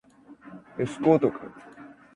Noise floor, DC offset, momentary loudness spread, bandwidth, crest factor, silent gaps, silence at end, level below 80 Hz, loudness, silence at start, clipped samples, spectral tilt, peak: -50 dBFS; under 0.1%; 25 LU; 10.5 kHz; 22 dB; none; 0.3 s; -64 dBFS; -25 LUFS; 0.3 s; under 0.1%; -8 dB/octave; -6 dBFS